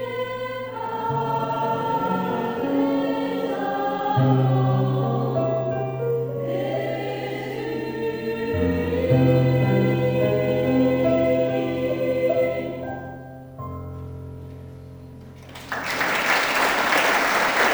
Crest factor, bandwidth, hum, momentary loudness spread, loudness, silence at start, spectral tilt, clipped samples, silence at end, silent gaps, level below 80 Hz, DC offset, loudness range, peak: 18 dB; over 20 kHz; none; 17 LU; -22 LUFS; 0 s; -6 dB/octave; under 0.1%; 0 s; none; -50 dBFS; under 0.1%; 7 LU; -6 dBFS